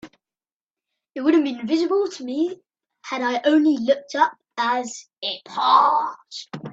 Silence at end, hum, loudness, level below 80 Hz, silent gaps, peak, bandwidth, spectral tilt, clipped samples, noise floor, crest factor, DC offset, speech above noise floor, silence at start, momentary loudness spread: 0 s; none; -21 LUFS; -72 dBFS; 0.53-0.60 s; -4 dBFS; 8 kHz; -4 dB/octave; under 0.1%; under -90 dBFS; 18 dB; under 0.1%; over 69 dB; 0.05 s; 17 LU